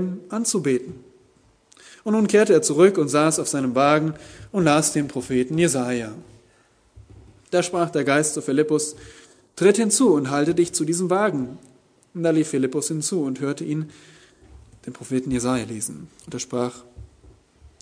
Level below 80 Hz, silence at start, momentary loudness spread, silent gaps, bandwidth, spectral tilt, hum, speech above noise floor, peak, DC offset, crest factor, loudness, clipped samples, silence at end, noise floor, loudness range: -56 dBFS; 0 s; 16 LU; none; 11 kHz; -4.5 dB/octave; none; 38 dB; -4 dBFS; under 0.1%; 20 dB; -21 LUFS; under 0.1%; 0.15 s; -59 dBFS; 9 LU